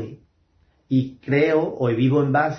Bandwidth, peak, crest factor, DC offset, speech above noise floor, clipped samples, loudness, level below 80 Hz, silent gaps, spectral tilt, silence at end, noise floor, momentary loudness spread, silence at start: 6.2 kHz; -6 dBFS; 16 dB; under 0.1%; 42 dB; under 0.1%; -21 LUFS; -58 dBFS; none; -9 dB/octave; 0 s; -62 dBFS; 5 LU; 0 s